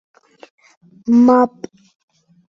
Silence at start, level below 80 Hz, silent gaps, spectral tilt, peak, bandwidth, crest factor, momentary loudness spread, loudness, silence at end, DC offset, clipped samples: 1.05 s; -62 dBFS; none; -7.5 dB/octave; -2 dBFS; 6.8 kHz; 16 dB; 25 LU; -13 LUFS; 1.05 s; under 0.1%; under 0.1%